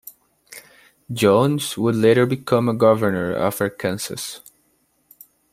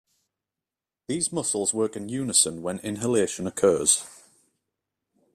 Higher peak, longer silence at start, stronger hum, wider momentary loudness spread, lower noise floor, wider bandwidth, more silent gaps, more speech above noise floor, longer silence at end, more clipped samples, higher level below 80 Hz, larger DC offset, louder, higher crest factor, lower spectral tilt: first, -2 dBFS vs -6 dBFS; second, 0.05 s vs 1.1 s; neither; first, 18 LU vs 11 LU; second, -64 dBFS vs -89 dBFS; about the same, 16 kHz vs 15 kHz; neither; second, 46 dB vs 64 dB; about the same, 1.15 s vs 1.2 s; neither; about the same, -60 dBFS vs -64 dBFS; neither; first, -19 LUFS vs -24 LUFS; about the same, 20 dB vs 22 dB; first, -5.5 dB/octave vs -3 dB/octave